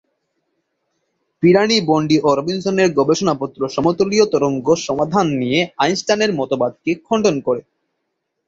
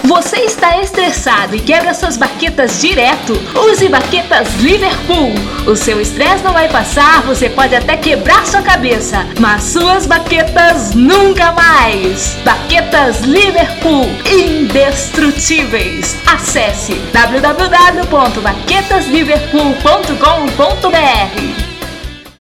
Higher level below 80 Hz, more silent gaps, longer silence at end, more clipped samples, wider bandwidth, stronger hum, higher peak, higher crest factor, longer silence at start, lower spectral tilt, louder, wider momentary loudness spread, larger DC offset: second, -56 dBFS vs -24 dBFS; neither; first, 0.9 s vs 0.1 s; second, under 0.1% vs 0.3%; second, 8 kHz vs 18 kHz; neither; about the same, -2 dBFS vs 0 dBFS; first, 16 dB vs 10 dB; first, 1.4 s vs 0 s; first, -5 dB/octave vs -3.5 dB/octave; second, -17 LUFS vs -9 LUFS; about the same, 6 LU vs 6 LU; neither